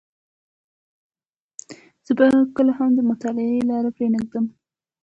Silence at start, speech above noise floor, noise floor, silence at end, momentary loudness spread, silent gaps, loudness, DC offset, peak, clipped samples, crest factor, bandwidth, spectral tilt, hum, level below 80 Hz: 1.7 s; 26 dB; -45 dBFS; 0.55 s; 23 LU; none; -20 LUFS; under 0.1%; -4 dBFS; under 0.1%; 18 dB; 8 kHz; -6.5 dB/octave; none; -62 dBFS